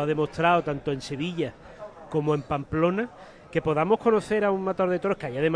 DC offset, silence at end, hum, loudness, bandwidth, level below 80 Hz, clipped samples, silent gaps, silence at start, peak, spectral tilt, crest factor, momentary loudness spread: under 0.1%; 0 s; none; -26 LUFS; 10.5 kHz; -54 dBFS; under 0.1%; none; 0 s; -8 dBFS; -7 dB/octave; 18 dB; 9 LU